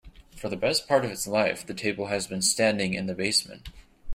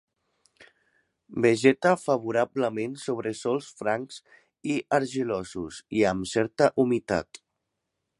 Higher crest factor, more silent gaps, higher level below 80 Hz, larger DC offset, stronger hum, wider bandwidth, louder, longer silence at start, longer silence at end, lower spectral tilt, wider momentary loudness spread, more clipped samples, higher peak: about the same, 20 dB vs 22 dB; neither; first, -50 dBFS vs -60 dBFS; neither; neither; first, 16 kHz vs 11.5 kHz; about the same, -26 LUFS vs -26 LUFS; second, 0.05 s vs 0.6 s; second, 0 s vs 0.95 s; second, -3 dB/octave vs -5.5 dB/octave; second, 10 LU vs 14 LU; neither; second, -8 dBFS vs -4 dBFS